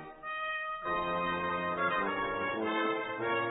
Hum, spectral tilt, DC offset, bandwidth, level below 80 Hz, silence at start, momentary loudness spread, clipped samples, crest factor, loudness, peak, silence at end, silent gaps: none; 0 dB/octave; under 0.1%; 3.9 kHz; -62 dBFS; 0 s; 4 LU; under 0.1%; 14 dB; -33 LUFS; -20 dBFS; 0 s; none